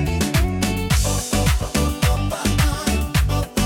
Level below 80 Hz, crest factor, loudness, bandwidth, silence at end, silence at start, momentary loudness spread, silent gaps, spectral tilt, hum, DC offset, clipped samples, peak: -24 dBFS; 16 dB; -20 LUFS; 18 kHz; 0 s; 0 s; 2 LU; none; -4.5 dB/octave; none; under 0.1%; under 0.1%; -4 dBFS